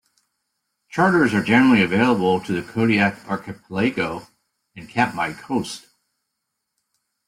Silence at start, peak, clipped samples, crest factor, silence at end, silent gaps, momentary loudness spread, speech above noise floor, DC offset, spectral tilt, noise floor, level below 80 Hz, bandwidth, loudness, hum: 0.95 s; -2 dBFS; under 0.1%; 18 dB; 1.5 s; none; 14 LU; 59 dB; under 0.1%; -6 dB/octave; -78 dBFS; -56 dBFS; 14.5 kHz; -20 LUFS; none